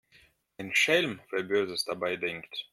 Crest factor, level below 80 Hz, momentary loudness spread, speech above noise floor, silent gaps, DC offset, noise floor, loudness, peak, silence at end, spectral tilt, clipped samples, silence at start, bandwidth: 20 dB; -72 dBFS; 11 LU; 33 dB; none; under 0.1%; -63 dBFS; -28 LUFS; -12 dBFS; 0.1 s; -3 dB/octave; under 0.1%; 0.6 s; 16 kHz